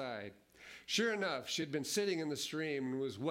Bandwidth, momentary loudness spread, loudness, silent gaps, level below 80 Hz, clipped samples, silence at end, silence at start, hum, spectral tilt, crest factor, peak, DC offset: 16 kHz; 17 LU; -37 LUFS; none; -80 dBFS; under 0.1%; 0 s; 0 s; none; -3.5 dB/octave; 16 dB; -22 dBFS; under 0.1%